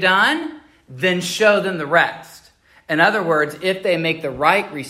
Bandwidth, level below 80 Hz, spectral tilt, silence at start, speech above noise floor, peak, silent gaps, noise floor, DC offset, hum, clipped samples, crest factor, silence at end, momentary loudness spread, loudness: 16 kHz; -58 dBFS; -4 dB/octave; 0 s; 34 dB; 0 dBFS; none; -52 dBFS; under 0.1%; none; under 0.1%; 18 dB; 0 s; 7 LU; -18 LUFS